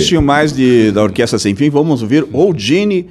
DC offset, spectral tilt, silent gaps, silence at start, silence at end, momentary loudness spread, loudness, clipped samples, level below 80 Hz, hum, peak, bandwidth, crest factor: under 0.1%; -5.5 dB/octave; none; 0 s; 0.05 s; 3 LU; -12 LUFS; under 0.1%; -36 dBFS; none; 0 dBFS; 13 kHz; 12 dB